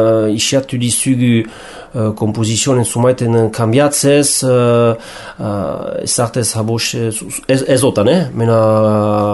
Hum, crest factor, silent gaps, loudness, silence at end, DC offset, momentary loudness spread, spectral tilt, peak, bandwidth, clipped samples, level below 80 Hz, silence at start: none; 12 dB; none; -13 LUFS; 0 s; under 0.1%; 9 LU; -5 dB/octave; -2 dBFS; 12 kHz; under 0.1%; -46 dBFS; 0 s